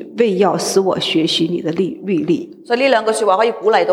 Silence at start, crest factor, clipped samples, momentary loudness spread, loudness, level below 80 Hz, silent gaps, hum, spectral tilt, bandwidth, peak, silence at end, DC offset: 0 s; 14 dB; under 0.1%; 6 LU; -16 LUFS; -64 dBFS; none; none; -4.5 dB/octave; 16 kHz; -2 dBFS; 0 s; under 0.1%